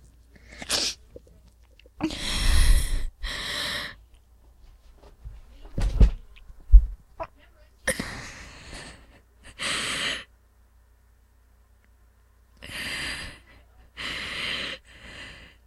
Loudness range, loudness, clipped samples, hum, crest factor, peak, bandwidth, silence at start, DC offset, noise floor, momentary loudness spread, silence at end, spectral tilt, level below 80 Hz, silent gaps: 9 LU; -28 LUFS; under 0.1%; none; 26 dB; 0 dBFS; 13.5 kHz; 0.5 s; under 0.1%; -58 dBFS; 23 LU; 0.2 s; -3.5 dB/octave; -28 dBFS; none